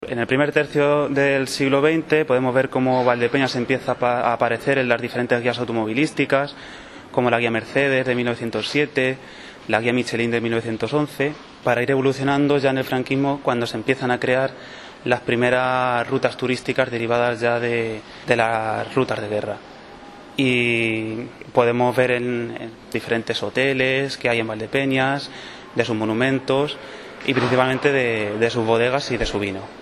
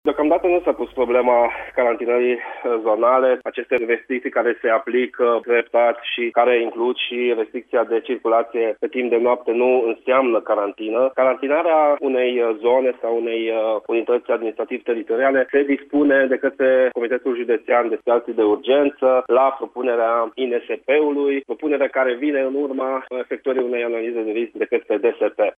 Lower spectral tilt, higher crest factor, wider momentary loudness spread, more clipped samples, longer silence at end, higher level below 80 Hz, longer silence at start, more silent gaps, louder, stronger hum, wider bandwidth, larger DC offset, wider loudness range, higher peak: about the same, -5.5 dB/octave vs -6.5 dB/octave; first, 20 dB vs 14 dB; first, 10 LU vs 7 LU; neither; about the same, 0 s vs 0.05 s; first, -50 dBFS vs -62 dBFS; about the same, 0 s vs 0.05 s; neither; about the same, -21 LUFS vs -19 LUFS; neither; first, 13 kHz vs 3.8 kHz; neither; about the same, 3 LU vs 2 LU; first, 0 dBFS vs -4 dBFS